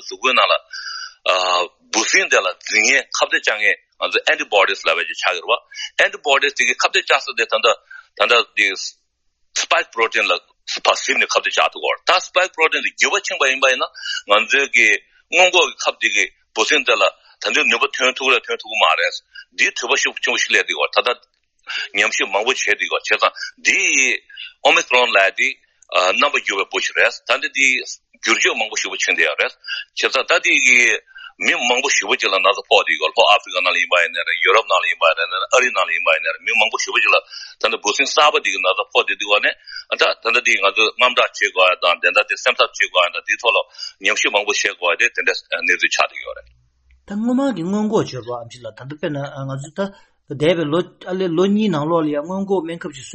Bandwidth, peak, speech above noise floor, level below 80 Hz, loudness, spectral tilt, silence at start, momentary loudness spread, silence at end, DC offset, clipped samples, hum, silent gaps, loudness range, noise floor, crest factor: 8.8 kHz; 0 dBFS; 48 dB; -64 dBFS; -16 LUFS; -1.5 dB/octave; 0 s; 10 LU; 0 s; under 0.1%; under 0.1%; none; none; 5 LU; -66 dBFS; 18 dB